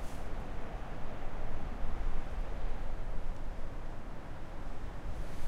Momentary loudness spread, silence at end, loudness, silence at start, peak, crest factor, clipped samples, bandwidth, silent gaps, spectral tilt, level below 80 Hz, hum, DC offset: 5 LU; 0 s; -45 LUFS; 0 s; -20 dBFS; 12 dB; under 0.1%; 5.2 kHz; none; -6.5 dB/octave; -36 dBFS; none; under 0.1%